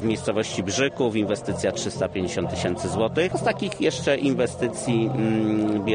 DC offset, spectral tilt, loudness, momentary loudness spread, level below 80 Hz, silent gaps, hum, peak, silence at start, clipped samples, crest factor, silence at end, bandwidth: under 0.1%; -5 dB/octave; -24 LUFS; 4 LU; -52 dBFS; none; none; -8 dBFS; 0 s; under 0.1%; 16 dB; 0 s; 10 kHz